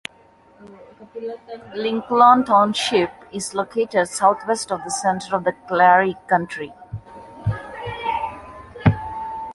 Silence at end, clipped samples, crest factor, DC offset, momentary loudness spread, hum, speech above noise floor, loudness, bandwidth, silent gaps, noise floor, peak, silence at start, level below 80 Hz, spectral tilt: 0 s; under 0.1%; 20 dB; under 0.1%; 19 LU; none; 33 dB; -20 LUFS; 11.5 kHz; none; -52 dBFS; -2 dBFS; 0.6 s; -46 dBFS; -4.5 dB/octave